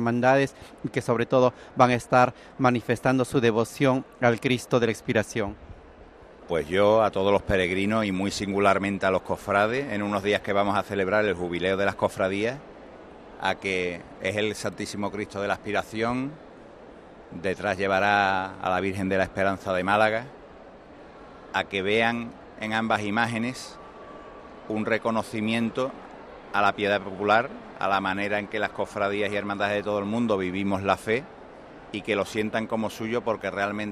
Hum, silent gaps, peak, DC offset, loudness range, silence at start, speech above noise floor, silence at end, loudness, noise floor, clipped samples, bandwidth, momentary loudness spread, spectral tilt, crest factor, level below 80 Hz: none; none; -4 dBFS; under 0.1%; 6 LU; 0 s; 23 dB; 0 s; -25 LUFS; -48 dBFS; under 0.1%; 13.5 kHz; 14 LU; -5.5 dB/octave; 22 dB; -54 dBFS